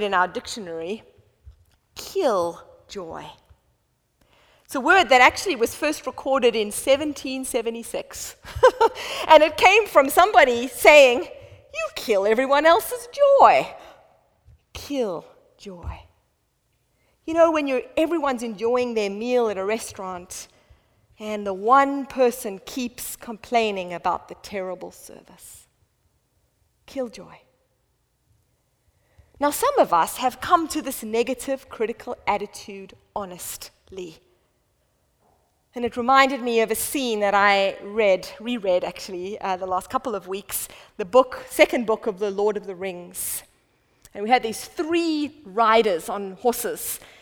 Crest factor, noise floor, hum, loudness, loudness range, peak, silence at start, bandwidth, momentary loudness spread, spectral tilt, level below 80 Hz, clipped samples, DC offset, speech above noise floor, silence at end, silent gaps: 22 dB; -69 dBFS; none; -21 LUFS; 16 LU; 0 dBFS; 0 s; over 20 kHz; 20 LU; -3 dB/octave; -54 dBFS; under 0.1%; under 0.1%; 48 dB; 0.25 s; none